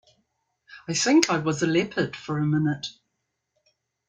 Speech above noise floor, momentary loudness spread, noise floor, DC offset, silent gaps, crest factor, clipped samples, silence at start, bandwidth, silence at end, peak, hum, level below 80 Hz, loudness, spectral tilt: 55 dB; 12 LU; -79 dBFS; under 0.1%; none; 26 dB; under 0.1%; 0.7 s; 9.4 kHz; 1.15 s; 0 dBFS; none; -64 dBFS; -24 LUFS; -4.5 dB/octave